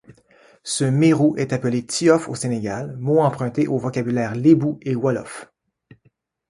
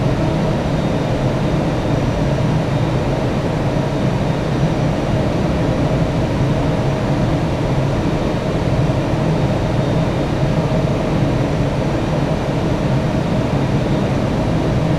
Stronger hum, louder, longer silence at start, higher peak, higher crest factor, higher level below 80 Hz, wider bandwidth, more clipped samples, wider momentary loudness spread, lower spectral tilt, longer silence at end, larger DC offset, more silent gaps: neither; about the same, -20 LUFS vs -18 LUFS; about the same, 0.1 s vs 0 s; about the same, -2 dBFS vs -4 dBFS; first, 18 dB vs 12 dB; second, -60 dBFS vs -28 dBFS; about the same, 11.5 kHz vs 12.5 kHz; neither; first, 11 LU vs 1 LU; second, -6 dB/octave vs -7.5 dB/octave; first, 1.05 s vs 0 s; neither; neither